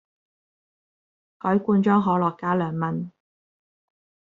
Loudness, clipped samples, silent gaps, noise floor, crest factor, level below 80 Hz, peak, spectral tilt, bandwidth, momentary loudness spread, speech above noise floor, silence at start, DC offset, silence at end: -23 LUFS; under 0.1%; none; under -90 dBFS; 20 dB; -66 dBFS; -6 dBFS; -7.5 dB/octave; 4.1 kHz; 11 LU; over 68 dB; 1.45 s; under 0.1%; 1.2 s